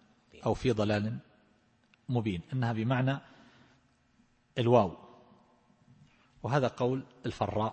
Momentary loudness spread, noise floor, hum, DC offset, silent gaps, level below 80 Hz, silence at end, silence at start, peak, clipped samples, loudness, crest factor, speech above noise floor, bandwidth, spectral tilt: 14 LU; -68 dBFS; none; under 0.1%; none; -58 dBFS; 0 s; 0.35 s; -10 dBFS; under 0.1%; -31 LUFS; 24 dB; 38 dB; 8.6 kHz; -7.5 dB/octave